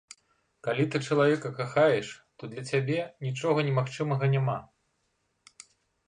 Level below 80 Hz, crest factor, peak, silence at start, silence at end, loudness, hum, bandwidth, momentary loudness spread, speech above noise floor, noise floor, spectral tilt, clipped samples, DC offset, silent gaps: -68 dBFS; 18 dB; -10 dBFS; 0.65 s; 1.4 s; -28 LUFS; none; 10 kHz; 13 LU; 48 dB; -76 dBFS; -6.5 dB/octave; under 0.1%; under 0.1%; none